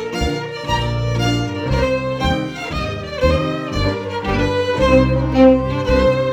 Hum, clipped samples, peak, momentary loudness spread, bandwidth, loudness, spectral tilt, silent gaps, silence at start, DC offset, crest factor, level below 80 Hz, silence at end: none; under 0.1%; -2 dBFS; 10 LU; 14 kHz; -18 LUFS; -6.5 dB/octave; none; 0 s; under 0.1%; 16 dB; -28 dBFS; 0 s